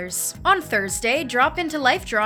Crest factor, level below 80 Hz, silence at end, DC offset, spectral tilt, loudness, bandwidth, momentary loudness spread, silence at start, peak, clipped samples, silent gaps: 18 dB; -46 dBFS; 0 s; under 0.1%; -2 dB/octave; -21 LUFS; over 20 kHz; 3 LU; 0 s; -4 dBFS; under 0.1%; none